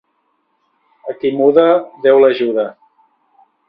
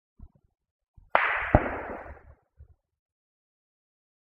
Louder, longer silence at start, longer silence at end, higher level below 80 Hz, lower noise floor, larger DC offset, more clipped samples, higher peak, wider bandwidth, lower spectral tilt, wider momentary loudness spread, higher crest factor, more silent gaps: first, -13 LUFS vs -27 LUFS; first, 1.05 s vs 0.2 s; second, 0.95 s vs 1.55 s; second, -64 dBFS vs -44 dBFS; first, -64 dBFS vs -57 dBFS; neither; neither; about the same, 0 dBFS vs 0 dBFS; about the same, 5.2 kHz vs 5.4 kHz; about the same, -8.5 dB/octave vs -9 dB/octave; about the same, 15 LU vs 17 LU; second, 16 dB vs 32 dB; second, none vs 0.71-0.79 s, 0.88-0.94 s